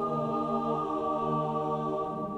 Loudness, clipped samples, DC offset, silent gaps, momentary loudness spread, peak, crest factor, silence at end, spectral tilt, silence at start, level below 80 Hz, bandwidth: -31 LUFS; under 0.1%; under 0.1%; none; 2 LU; -18 dBFS; 14 dB; 0 s; -8.5 dB/octave; 0 s; -60 dBFS; 10.5 kHz